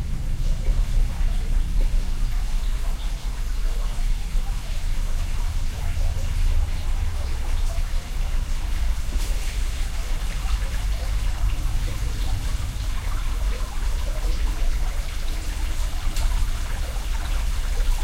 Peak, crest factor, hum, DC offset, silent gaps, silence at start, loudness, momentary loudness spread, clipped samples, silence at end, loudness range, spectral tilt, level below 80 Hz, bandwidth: -10 dBFS; 12 dB; none; 0.5%; none; 0 s; -29 LUFS; 3 LU; under 0.1%; 0 s; 1 LU; -4.5 dB/octave; -22 dBFS; 15.5 kHz